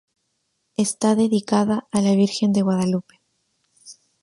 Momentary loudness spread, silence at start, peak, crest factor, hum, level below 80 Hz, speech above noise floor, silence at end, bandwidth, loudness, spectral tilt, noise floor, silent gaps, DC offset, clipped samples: 6 LU; 0.8 s; -4 dBFS; 18 dB; none; -62 dBFS; 53 dB; 0.3 s; 11.5 kHz; -20 LUFS; -6 dB/octave; -72 dBFS; none; under 0.1%; under 0.1%